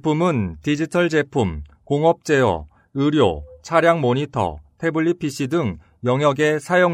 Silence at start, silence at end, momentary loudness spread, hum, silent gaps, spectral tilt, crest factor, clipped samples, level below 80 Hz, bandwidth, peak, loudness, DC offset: 0.05 s; 0 s; 9 LU; none; none; -6.5 dB/octave; 18 dB; under 0.1%; -44 dBFS; 14.5 kHz; -2 dBFS; -20 LUFS; under 0.1%